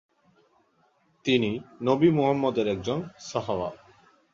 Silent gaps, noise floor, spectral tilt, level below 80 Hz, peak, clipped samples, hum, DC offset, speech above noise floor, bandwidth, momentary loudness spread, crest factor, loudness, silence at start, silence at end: none; -66 dBFS; -6.5 dB/octave; -60 dBFS; -8 dBFS; under 0.1%; none; under 0.1%; 41 dB; 7.6 kHz; 11 LU; 20 dB; -26 LUFS; 1.25 s; 0.6 s